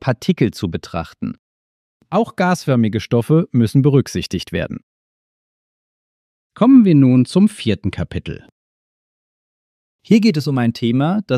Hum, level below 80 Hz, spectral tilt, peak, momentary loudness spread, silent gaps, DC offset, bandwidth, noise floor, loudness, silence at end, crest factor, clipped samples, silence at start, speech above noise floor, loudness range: none; -46 dBFS; -7.5 dB/octave; 0 dBFS; 16 LU; 1.39-2.00 s, 4.83-6.50 s, 8.52-9.99 s; under 0.1%; 13.5 kHz; under -90 dBFS; -16 LUFS; 0 s; 16 dB; under 0.1%; 0 s; over 75 dB; 5 LU